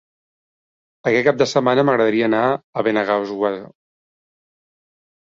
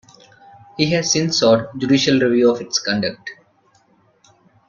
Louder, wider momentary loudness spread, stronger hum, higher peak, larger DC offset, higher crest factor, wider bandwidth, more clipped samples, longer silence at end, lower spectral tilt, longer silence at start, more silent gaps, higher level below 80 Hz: about the same, -18 LUFS vs -17 LUFS; second, 7 LU vs 13 LU; neither; about the same, -2 dBFS vs -2 dBFS; neither; about the same, 18 dB vs 18 dB; about the same, 7.8 kHz vs 7.4 kHz; neither; first, 1.65 s vs 1.35 s; first, -5.5 dB/octave vs -4 dB/octave; first, 1.05 s vs 0.8 s; first, 2.64-2.73 s vs none; second, -62 dBFS vs -56 dBFS